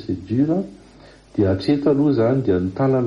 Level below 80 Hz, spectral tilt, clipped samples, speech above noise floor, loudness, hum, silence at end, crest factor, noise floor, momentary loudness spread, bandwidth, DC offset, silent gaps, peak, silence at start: -50 dBFS; -9.5 dB/octave; under 0.1%; 28 dB; -19 LUFS; none; 0 s; 12 dB; -46 dBFS; 7 LU; 7.2 kHz; under 0.1%; none; -6 dBFS; 0 s